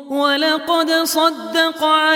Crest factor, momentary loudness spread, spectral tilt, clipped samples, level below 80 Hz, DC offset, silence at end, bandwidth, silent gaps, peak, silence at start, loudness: 14 dB; 3 LU; -0.5 dB/octave; under 0.1%; -68 dBFS; under 0.1%; 0 s; 18.5 kHz; none; -2 dBFS; 0 s; -16 LUFS